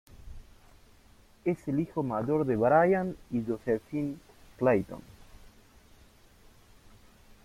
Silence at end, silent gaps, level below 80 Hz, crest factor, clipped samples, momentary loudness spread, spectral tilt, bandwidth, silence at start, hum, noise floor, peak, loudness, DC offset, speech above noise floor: 1.95 s; none; -56 dBFS; 20 dB; under 0.1%; 12 LU; -8.5 dB/octave; 16 kHz; 0.2 s; none; -58 dBFS; -12 dBFS; -29 LUFS; under 0.1%; 30 dB